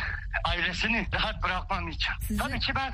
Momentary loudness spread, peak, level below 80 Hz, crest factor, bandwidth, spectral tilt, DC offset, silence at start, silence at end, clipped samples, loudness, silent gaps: 4 LU; -12 dBFS; -36 dBFS; 16 dB; 15.5 kHz; -4 dB/octave; under 0.1%; 0 s; 0 s; under 0.1%; -29 LUFS; none